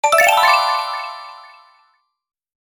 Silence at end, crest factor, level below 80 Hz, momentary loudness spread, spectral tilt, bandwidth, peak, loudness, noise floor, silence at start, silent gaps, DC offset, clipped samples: 1.25 s; 18 dB; -64 dBFS; 22 LU; 1.5 dB/octave; over 20 kHz; -2 dBFS; -14 LUFS; -62 dBFS; 0.05 s; none; under 0.1%; under 0.1%